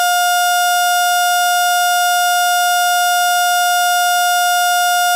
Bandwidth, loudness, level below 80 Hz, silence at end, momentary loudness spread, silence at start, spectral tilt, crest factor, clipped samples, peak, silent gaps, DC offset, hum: 16 kHz; -13 LUFS; -72 dBFS; 0 s; 0 LU; 0 s; 7 dB/octave; 10 dB; under 0.1%; -4 dBFS; none; 0.2%; none